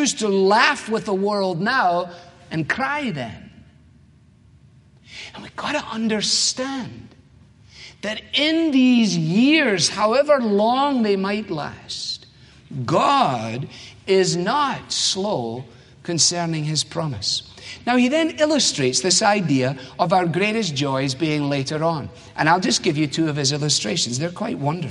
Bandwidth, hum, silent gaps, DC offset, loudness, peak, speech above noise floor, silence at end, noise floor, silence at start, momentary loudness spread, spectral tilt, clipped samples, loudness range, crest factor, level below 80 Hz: 11.5 kHz; none; none; under 0.1%; -20 LUFS; -2 dBFS; 31 dB; 0 s; -52 dBFS; 0 s; 14 LU; -3.5 dB/octave; under 0.1%; 7 LU; 20 dB; -58 dBFS